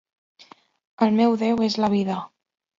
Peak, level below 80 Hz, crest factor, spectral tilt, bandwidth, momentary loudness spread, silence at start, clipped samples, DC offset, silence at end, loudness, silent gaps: -6 dBFS; -64 dBFS; 18 dB; -6.5 dB/octave; 7.6 kHz; 11 LU; 1 s; under 0.1%; under 0.1%; 0.5 s; -22 LUFS; none